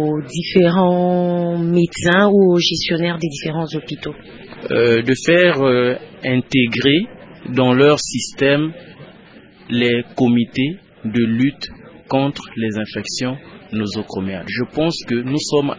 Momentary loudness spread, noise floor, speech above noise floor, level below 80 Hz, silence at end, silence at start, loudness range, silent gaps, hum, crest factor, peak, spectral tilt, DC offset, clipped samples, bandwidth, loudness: 13 LU; -43 dBFS; 27 dB; -50 dBFS; 0 s; 0 s; 6 LU; none; none; 18 dB; 0 dBFS; -5.5 dB/octave; under 0.1%; under 0.1%; 8 kHz; -17 LUFS